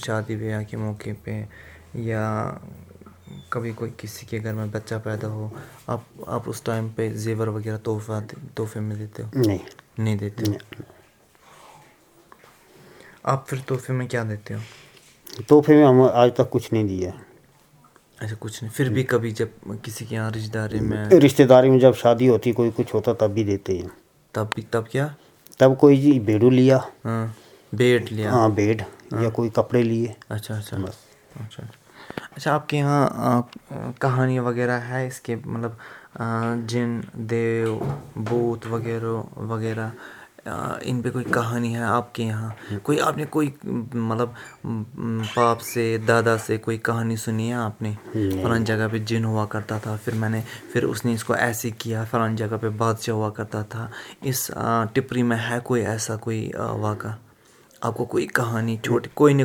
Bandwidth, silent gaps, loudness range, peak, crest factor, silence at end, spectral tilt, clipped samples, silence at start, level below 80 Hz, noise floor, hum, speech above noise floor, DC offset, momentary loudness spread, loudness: 19.5 kHz; none; 11 LU; 0 dBFS; 22 dB; 0 s; -6.5 dB/octave; under 0.1%; 0 s; -58 dBFS; -55 dBFS; none; 33 dB; under 0.1%; 16 LU; -23 LUFS